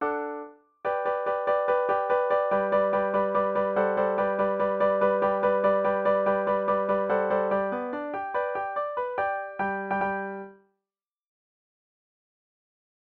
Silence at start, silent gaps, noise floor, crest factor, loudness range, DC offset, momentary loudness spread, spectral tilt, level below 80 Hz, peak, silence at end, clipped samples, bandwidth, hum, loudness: 0 s; none; under -90 dBFS; 16 dB; 8 LU; under 0.1%; 8 LU; -8.5 dB/octave; -64 dBFS; -12 dBFS; 2.5 s; under 0.1%; 4.4 kHz; none; -26 LUFS